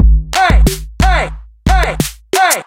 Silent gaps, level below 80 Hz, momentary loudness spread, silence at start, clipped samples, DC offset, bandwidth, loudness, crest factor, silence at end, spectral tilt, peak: none; -14 dBFS; 8 LU; 0 s; under 0.1%; under 0.1%; 16.5 kHz; -14 LUFS; 12 dB; 0.05 s; -4 dB/octave; 0 dBFS